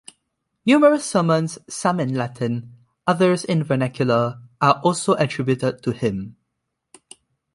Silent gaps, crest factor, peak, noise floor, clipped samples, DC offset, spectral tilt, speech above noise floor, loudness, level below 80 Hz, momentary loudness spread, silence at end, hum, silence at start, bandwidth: none; 18 dB; -2 dBFS; -78 dBFS; under 0.1%; under 0.1%; -6 dB/octave; 58 dB; -20 LUFS; -58 dBFS; 10 LU; 1.25 s; none; 0.65 s; 11.5 kHz